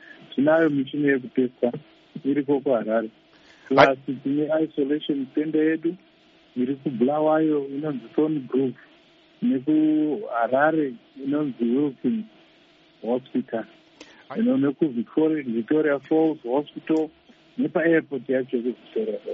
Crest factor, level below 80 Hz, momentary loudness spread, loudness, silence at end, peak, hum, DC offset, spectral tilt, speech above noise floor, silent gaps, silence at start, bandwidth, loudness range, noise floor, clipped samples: 24 dB; -70 dBFS; 10 LU; -24 LUFS; 0 s; 0 dBFS; none; under 0.1%; -5 dB/octave; 33 dB; none; 0.35 s; 6.2 kHz; 3 LU; -56 dBFS; under 0.1%